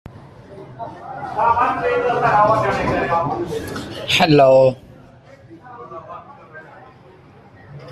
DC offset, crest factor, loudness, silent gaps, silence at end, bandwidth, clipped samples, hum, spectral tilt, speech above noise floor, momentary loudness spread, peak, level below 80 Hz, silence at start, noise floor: under 0.1%; 18 dB; -16 LUFS; none; 0 s; 13.5 kHz; under 0.1%; none; -5.5 dB/octave; 28 dB; 26 LU; -2 dBFS; -48 dBFS; 0.1 s; -45 dBFS